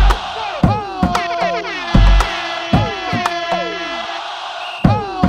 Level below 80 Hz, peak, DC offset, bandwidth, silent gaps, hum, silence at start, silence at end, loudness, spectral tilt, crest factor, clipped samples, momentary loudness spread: -20 dBFS; 0 dBFS; under 0.1%; 10.5 kHz; none; none; 0 s; 0 s; -18 LUFS; -6 dB/octave; 16 dB; under 0.1%; 9 LU